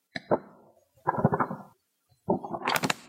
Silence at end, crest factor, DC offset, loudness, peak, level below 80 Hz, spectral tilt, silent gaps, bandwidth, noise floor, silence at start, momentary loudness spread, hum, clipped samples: 0 s; 28 dB; under 0.1%; -30 LUFS; -4 dBFS; -64 dBFS; -5 dB/octave; none; 16 kHz; -70 dBFS; 0.15 s; 7 LU; none; under 0.1%